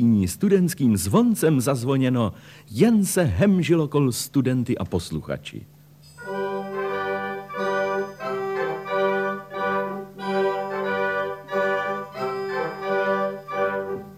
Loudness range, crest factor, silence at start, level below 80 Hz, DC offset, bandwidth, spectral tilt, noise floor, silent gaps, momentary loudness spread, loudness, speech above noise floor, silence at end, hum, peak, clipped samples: 7 LU; 18 dB; 0 s; -52 dBFS; under 0.1%; 15.5 kHz; -6 dB/octave; -46 dBFS; none; 10 LU; -23 LUFS; 26 dB; 0 s; none; -6 dBFS; under 0.1%